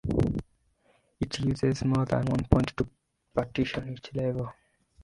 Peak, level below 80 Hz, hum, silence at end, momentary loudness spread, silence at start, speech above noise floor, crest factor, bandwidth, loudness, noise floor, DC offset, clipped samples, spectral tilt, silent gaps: -2 dBFS; -42 dBFS; none; 0.5 s; 11 LU; 0.05 s; 40 dB; 28 dB; 11.5 kHz; -29 LUFS; -67 dBFS; under 0.1%; under 0.1%; -7 dB/octave; none